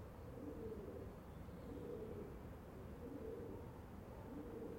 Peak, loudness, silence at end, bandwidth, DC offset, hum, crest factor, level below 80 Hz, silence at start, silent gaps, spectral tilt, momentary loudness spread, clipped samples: -38 dBFS; -53 LUFS; 0 s; 16.5 kHz; under 0.1%; none; 12 dB; -62 dBFS; 0 s; none; -8 dB/octave; 5 LU; under 0.1%